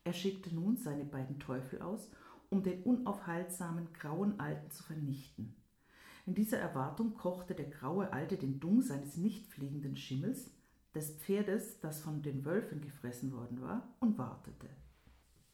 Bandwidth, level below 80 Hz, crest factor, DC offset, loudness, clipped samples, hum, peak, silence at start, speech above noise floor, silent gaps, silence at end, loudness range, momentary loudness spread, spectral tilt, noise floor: 17.5 kHz; -70 dBFS; 18 dB; under 0.1%; -39 LUFS; under 0.1%; none; -20 dBFS; 0.05 s; 27 dB; none; 0.4 s; 3 LU; 11 LU; -6.5 dB/octave; -66 dBFS